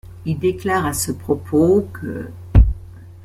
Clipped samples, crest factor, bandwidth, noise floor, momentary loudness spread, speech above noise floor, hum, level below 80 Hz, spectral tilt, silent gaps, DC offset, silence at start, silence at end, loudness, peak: under 0.1%; 16 dB; 15.5 kHz; -37 dBFS; 13 LU; 18 dB; none; -24 dBFS; -6.5 dB/octave; none; under 0.1%; 0.05 s; 0.05 s; -19 LUFS; -2 dBFS